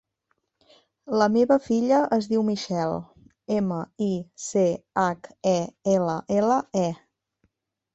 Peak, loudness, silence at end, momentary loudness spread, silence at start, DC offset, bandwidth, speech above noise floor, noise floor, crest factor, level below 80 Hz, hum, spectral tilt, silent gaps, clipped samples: -6 dBFS; -24 LUFS; 1 s; 8 LU; 1.05 s; under 0.1%; 8.2 kHz; 52 dB; -75 dBFS; 18 dB; -62 dBFS; none; -6 dB/octave; none; under 0.1%